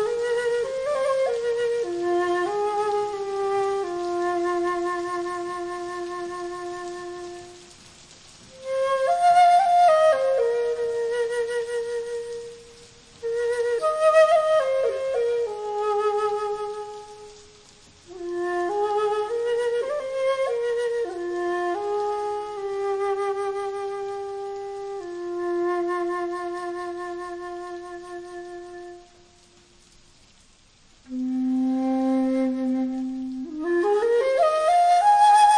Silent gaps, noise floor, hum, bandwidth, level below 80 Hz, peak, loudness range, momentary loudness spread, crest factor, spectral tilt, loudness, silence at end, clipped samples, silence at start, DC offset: none; -55 dBFS; none; 10.5 kHz; -62 dBFS; -6 dBFS; 12 LU; 17 LU; 18 dB; -3.5 dB/octave; -24 LUFS; 0 s; under 0.1%; 0 s; under 0.1%